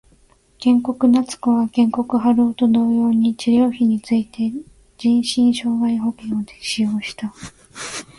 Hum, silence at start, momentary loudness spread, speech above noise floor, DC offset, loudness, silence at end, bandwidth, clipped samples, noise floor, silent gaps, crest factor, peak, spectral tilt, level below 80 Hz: none; 0.6 s; 13 LU; 37 dB; under 0.1%; -18 LUFS; 0.15 s; 11.5 kHz; under 0.1%; -54 dBFS; none; 12 dB; -6 dBFS; -5 dB/octave; -54 dBFS